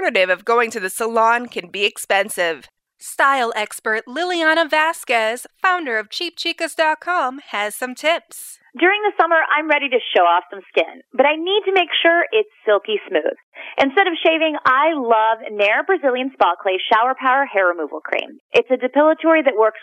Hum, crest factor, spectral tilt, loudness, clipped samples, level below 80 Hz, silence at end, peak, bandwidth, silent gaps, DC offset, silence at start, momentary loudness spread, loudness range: none; 16 dB; -2 dB/octave; -18 LUFS; under 0.1%; -74 dBFS; 0.05 s; -2 dBFS; 16 kHz; 13.43-13.52 s, 18.40-18.49 s; under 0.1%; 0 s; 8 LU; 3 LU